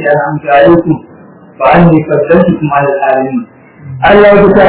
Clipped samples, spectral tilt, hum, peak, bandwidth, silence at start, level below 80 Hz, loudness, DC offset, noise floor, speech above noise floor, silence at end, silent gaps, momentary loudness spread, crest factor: 5%; -11 dB/octave; none; 0 dBFS; 4 kHz; 0 s; -34 dBFS; -7 LUFS; under 0.1%; -34 dBFS; 28 dB; 0 s; none; 12 LU; 8 dB